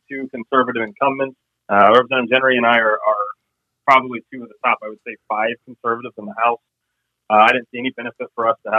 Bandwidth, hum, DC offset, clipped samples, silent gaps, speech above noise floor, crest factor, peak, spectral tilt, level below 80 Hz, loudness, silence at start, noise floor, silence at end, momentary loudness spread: 9 kHz; none; under 0.1%; under 0.1%; none; 58 dB; 18 dB; 0 dBFS; -5.5 dB/octave; -70 dBFS; -17 LUFS; 0.1 s; -76 dBFS; 0 s; 16 LU